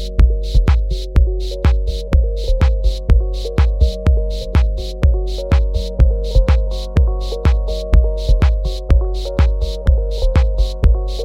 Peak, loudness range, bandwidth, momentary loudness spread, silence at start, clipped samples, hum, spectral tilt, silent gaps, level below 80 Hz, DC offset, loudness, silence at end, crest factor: 0 dBFS; 1 LU; 7.6 kHz; 4 LU; 0 s; under 0.1%; none; -7 dB/octave; none; -14 dBFS; under 0.1%; -17 LUFS; 0 s; 14 dB